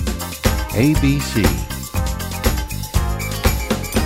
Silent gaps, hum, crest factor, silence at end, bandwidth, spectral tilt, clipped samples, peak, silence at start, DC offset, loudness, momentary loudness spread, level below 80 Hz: none; none; 18 dB; 0 s; 16.5 kHz; -5 dB/octave; under 0.1%; 0 dBFS; 0 s; under 0.1%; -20 LUFS; 7 LU; -24 dBFS